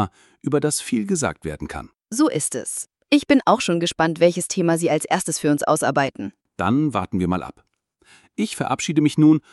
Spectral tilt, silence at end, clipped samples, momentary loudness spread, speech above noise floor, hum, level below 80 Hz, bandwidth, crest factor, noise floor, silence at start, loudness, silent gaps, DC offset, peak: -5 dB/octave; 0.15 s; under 0.1%; 14 LU; 36 dB; none; -52 dBFS; 12 kHz; 20 dB; -57 dBFS; 0 s; -21 LUFS; none; under 0.1%; -2 dBFS